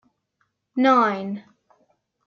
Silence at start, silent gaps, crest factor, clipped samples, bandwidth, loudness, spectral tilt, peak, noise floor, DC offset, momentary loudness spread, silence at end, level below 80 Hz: 0.75 s; none; 18 dB; under 0.1%; 6.8 kHz; -21 LUFS; -6.5 dB/octave; -6 dBFS; -73 dBFS; under 0.1%; 16 LU; 0.9 s; -78 dBFS